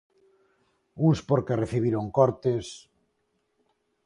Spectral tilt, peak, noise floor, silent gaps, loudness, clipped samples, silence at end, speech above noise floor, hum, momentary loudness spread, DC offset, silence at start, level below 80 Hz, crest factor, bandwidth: -8 dB/octave; -6 dBFS; -74 dBFS; none; -25 LUFS; under 0.1%; 1.25 s; 50 dB; none; 9 LU; under 0.1%; 0.95 s; -56 dBFS; 22 dB; 11 kHz